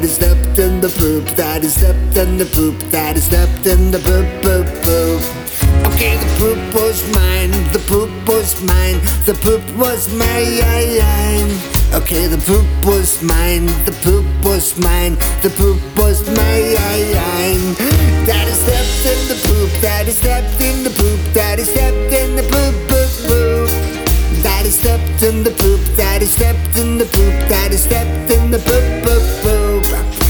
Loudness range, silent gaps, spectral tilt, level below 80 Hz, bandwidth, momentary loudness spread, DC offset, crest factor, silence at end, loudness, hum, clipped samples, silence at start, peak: 1 LU; none; -4.5 dB/octave; -16 dBFS; over 20 kHz; 3 LU; under 0.1%; 12 dB; 0 s; -13 LUFS; none; under 0.1%; 0 s; 0 dBFS